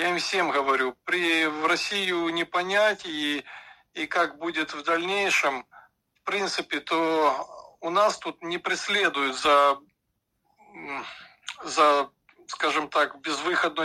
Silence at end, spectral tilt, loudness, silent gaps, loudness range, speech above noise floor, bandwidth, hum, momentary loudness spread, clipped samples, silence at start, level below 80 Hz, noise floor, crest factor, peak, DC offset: 0 s; -2.5 dB/octave; -25 LUFS; none; 3 LU; 52 dB; 14 kHz; none; 15 LU; under 0.1%; 0 s; -70 dBFS; -77 dBFS; 18 dB; -8 dBFS; under 0.1%